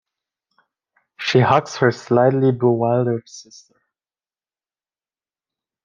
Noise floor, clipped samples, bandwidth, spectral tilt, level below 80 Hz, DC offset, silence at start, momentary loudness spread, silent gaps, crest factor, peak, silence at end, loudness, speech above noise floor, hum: under -90 dBFS; under 0.1%; 7.4 kHz; -6.5 dB/octave; -64 dBFS; under 0.1%; 1.2 s; 12 LU; none; 20 dB; -2 dBFS; 2.45 s; -18 LUFS; over 73 dB; none